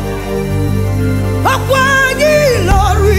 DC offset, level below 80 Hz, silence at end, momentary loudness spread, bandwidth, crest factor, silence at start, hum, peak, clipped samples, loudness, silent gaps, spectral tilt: under 0.1%; -20 dBFS; 0 s; 6 LU; 16.5 kHz; 12 dB; 0 s; 50 Hz at -30 dBFS; 0 dBFS; under 0.1%; -12 LUFS; none; -5.5 dB/octave